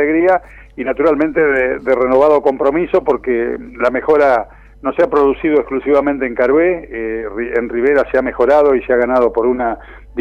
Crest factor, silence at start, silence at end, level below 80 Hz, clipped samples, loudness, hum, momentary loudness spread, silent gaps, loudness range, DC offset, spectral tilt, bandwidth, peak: 12 dB; 0 s; 0 s; -40 dBFS; under 0.1%; -14 LUFS; none; 10 LU; none; 1 LU; under 0.1%; -7.5 dB/octave; 6.8 kHz; -2 dBFS